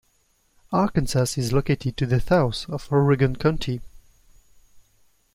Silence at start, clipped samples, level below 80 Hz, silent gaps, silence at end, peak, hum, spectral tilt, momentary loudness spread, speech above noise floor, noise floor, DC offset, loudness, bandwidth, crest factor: 0.7 s; under 0.1%; -40 dBFS; none; 0.55 s; -6 dBFS; none; -6.5 dB/octave; 8 LU; 43 dB; -65 dBFS; under 0.1%; -23 LUFS; 16 kHz; 18 dB